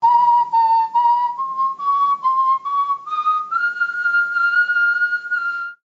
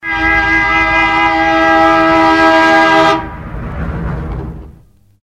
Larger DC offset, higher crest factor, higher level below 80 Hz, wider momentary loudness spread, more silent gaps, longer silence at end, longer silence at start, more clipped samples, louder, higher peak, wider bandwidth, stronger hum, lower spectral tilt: second, under 0.1% vs 0.3%; about the same, 12 dB vs 12 dB; second, under -90 dBFS vs -28 dBFS; second, 6 LU vs 16 LU; neither; second, 0.15 s vs 0.55 s; about the same, 0 s vs 0.05 s; neither; second, -17 LUFS vs -9 LUFS; second, -6 dBFS vs 0 dBFS; second, 7.6 kHz vs 11.5 kHz; neither; second, -1 dB/octave vs -5 dB/octave